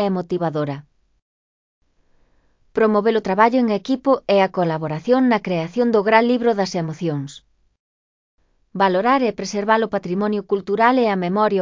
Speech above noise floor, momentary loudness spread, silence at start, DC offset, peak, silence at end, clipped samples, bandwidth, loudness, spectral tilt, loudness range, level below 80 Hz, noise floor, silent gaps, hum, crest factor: 41 dB; 9 LU; 0 s; under 0.1%; 0 dBFS; 0 s; under 0.1%; 7.6 kHz; -19 LUFS; -6.5 dB/octave; 4 LU; -60 dBFS; -59 dBFS; 1.22-1.81 s, 7.79-8.38 s; none; 20 dB